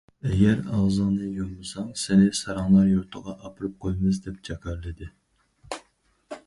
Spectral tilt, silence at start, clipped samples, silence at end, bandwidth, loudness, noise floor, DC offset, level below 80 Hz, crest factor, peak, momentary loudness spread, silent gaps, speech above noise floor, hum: -6.5 dB/octave; 0.25 s; under 0.1%; 0.1 s; 11.5 kHz; -24 LUFS; -64 dBFS; under 0.1%; -44 dBFS; 18 dB; -8 dBFS; 19 LU; none; 40 dB; none